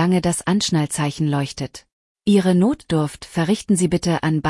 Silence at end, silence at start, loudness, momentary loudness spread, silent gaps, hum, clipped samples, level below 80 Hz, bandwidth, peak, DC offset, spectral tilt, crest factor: 0 s; 0 s; -20 LUFS; 8 LU; 1.92-2.15 s; none; under 0.1%; -48 dBFS; 12 kHz; -6 dBFS; under 0.1%; -5.5 dB/octave; 14 dB